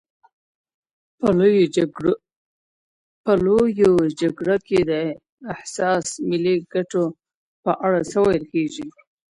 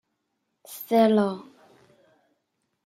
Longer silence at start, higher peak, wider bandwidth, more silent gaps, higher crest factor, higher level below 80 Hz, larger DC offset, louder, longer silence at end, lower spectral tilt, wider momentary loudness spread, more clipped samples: first, 1.2 s vs 0.7 s; first, -4 dBFS vs -8 dBFS; second, 11.5 kHz vs 16 kHz; first, 2.36-3.24 s, 5.29-5.38 s, 7.35-7.63 s vs none; about the same, 16 dB vs 20 dB; first, -54 dBFS vs -76 dBFS; neither; about the same, -20 LUFS vs -22 LUFS; second, 0.45 s vs 1.45 s; about the same, -6 dB/octave vs -6.5 dB/octave; second, 12 LU vs 20 LU; neither